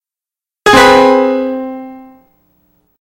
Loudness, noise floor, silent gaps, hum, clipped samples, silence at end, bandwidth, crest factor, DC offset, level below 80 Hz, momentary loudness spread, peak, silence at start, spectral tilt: -9 LUFS; -89 dBFS; none; none; 0.6%; 1.2 s; 16.5 kHz; 12 dB; under 0.1%; -40 dBFS; 21 LU; 0 dBFS; 0.65 s; -3.5 dB/octave